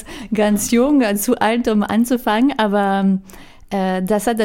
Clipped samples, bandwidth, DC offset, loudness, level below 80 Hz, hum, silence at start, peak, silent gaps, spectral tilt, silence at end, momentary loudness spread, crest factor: under 0.1%; 17 kHz; under 0.1%; -17 LUFS; -44 dBFS; none; 0 s; -2 dBFS; none; -5 dB/octave; 0 s; 6 LU; 14 dB